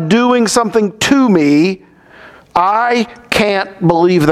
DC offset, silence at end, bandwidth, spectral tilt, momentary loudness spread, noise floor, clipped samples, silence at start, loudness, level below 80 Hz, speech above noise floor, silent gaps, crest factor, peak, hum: under 0.1%; 0 s; 15 kHz; -5 dB/octave; 6 LU; -39 dBFS; under 0.1%; 0 s; -12 LUFS; -46 dBFS; 28 dB; none; 12 dB; 0 dBFS; none